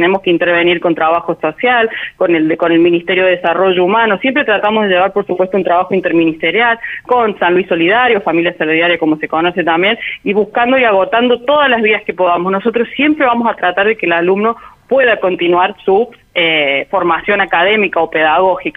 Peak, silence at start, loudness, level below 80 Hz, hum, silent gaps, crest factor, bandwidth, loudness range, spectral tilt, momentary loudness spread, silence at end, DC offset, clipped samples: -2 dBFS; 0 s; -12 LUFS; -52 dBFS; none; none; 10 dB; 4.5 kHz; 1 LU; -7.5 dB/octave; 4 LU; 0.05 s; under 0.1%; under 0.1%